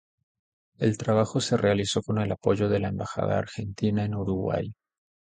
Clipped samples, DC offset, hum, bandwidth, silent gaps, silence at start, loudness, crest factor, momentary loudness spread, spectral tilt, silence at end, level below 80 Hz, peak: under 0.1%; under 0.1%; none; 9.4 kHz; none; 0.8 s; -27 LUFS; 18 dB; 6 LU; -6 dB/octave; 0.55 s; -50 dBFS; -8 dBFS